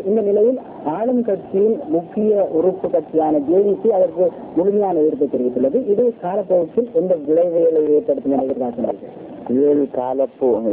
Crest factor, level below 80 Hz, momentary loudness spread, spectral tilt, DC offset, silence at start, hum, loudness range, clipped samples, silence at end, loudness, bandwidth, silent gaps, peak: 12 dB; -58 dBFS; 6 LU; -12.5 dB/octave; under 0.1%; 0 s; none; 1 LU; under 0.1%; 0 s; -18 LUFS; 3.7 kHz; none; -6 dBFS